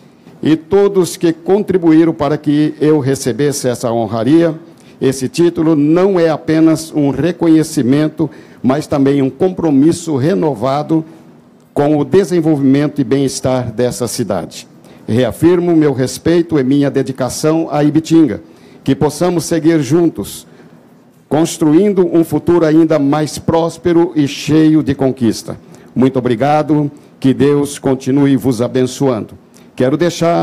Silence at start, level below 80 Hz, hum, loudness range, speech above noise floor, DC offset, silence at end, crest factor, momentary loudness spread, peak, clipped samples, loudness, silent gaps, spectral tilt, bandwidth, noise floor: 0.45 s; -46 dBFS; none; 2 LU; 32 dB; under 0.1%; 0 s; 12 dB; 7 LU; 0 dBFS; under 0.1%; -13 LUFS; none; -6.5 dB/octave; 15 kHz; -44 dBFS